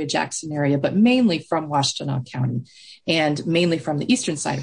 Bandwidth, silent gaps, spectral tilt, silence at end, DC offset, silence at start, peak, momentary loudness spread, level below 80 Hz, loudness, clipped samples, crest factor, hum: 10.5 kHz; none; -5 dB/octave; 0 s; under 0.1%; 0 s; -6 dBFS; 9 LU; -64 dBFS; -21 LUFS; under 0.1%; 14 dB; none